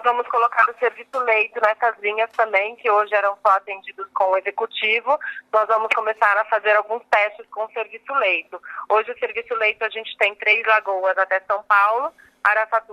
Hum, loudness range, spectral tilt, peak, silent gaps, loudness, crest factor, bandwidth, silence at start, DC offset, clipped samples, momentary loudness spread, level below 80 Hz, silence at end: none; 2 LU; -1.5 dB/octave; -2 dBFS; none; -20 LUFS; 18 dB; 12 kHz; 0 s; under 0.1%; under 0.1%; 9 LU; -74 dBFS; 0 s